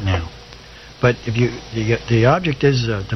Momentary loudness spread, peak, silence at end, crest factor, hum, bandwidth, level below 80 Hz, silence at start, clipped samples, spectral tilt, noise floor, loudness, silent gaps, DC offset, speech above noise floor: 23 LU; -2 dBFS; 0 s; 16 dB; none; 6.4 kHz; -40 dBFS; 0 s; under 0.1%; -6.5 dB/octave; -39 dBFS; -18 LUFS; none; under 0.1%; 22 dB